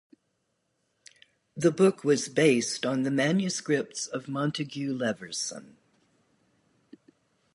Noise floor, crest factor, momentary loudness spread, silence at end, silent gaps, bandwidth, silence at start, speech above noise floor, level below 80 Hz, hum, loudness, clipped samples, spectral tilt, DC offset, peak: -76 dBFS; 20 dB; 10 LU; 1.95 s; none; 11.5 kHz; 1.55 s; 50 dB; -76 dBFS; none; -27 LUFS; under 0.1%; -4.5 dB/octave; under 0.1%; -8 dBFS